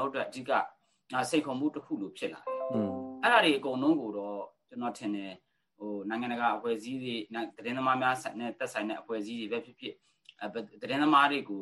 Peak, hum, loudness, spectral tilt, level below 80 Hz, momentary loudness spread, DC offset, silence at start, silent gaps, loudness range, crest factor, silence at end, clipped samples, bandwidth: -10 dBFS; none; -31 LUFS; -4.5 dB/octave; -80 dBFS; 15 LU; under 0.1%; 0 s; none; 5 LU; 22 dB; 0 s; under 0.1%; 12 kHz